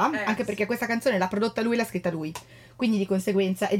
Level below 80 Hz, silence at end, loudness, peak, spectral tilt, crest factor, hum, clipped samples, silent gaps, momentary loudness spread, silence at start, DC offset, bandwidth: -62 dBFS; 0 s; -26 LUFS; -10 dBFS; -5.5 dB/octave; 16 dB; none; under 0.1%; none; 6 LU; 0 s; under 0.1%; 17 kHz